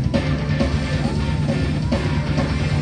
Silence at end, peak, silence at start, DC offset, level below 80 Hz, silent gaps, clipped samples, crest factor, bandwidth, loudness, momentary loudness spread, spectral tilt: 0 s; -6 dBFS; 0 s; under 0.1%; -28 dBFS; none; under 0.1%; 14 dB; 10 kHz; -21 LUFS; 1 LU; -7 dB/octave